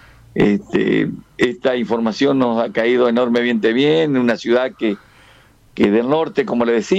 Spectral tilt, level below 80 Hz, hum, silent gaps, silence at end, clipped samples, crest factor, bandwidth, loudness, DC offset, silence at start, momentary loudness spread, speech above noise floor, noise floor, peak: -6.5 dB/octave; -52 dBFS; none; none; 0 s; under 0.1%; 12 dB; 9 kHz; -17 LUFS; under 0.1%; 0.35 s; 6 LU; 33 dB; -49 dBFS; -6 dBFS